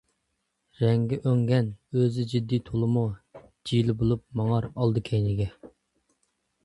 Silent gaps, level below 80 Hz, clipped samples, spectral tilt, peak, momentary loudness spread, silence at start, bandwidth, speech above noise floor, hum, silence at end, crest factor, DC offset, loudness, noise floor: none; -50 dBFS; under 0.1%; -8.5 dB/octave; -10 dBFS; 6 LU; 0.8 s; 11 kHz; 52 dB; none; 1 s; 16 dB; under 0.1%; -26 LUFS; -78 dBFS